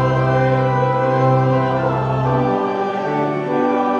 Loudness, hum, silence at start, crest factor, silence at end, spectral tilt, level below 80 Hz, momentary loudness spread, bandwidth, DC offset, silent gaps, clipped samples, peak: -17 LUFS; none; 0 s; 12 dB; 0 s; -8.5 dB/octave; -44 dBFS; 4 LU; 6.6 kHz; under 0.1%; none; under 0.1%; -4 dBFS